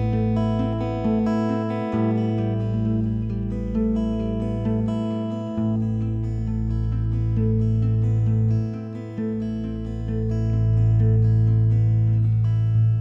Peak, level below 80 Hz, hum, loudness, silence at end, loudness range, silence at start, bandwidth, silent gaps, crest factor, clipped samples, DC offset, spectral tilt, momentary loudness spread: -10 dBFS; -34 dBFS; none; -23 LUFS; 0 s; 4 LU; 0 s; 5 kHz; none; 10 dB; under 0.1%; under 0.1%; -10.5 dB/octave; 8 LU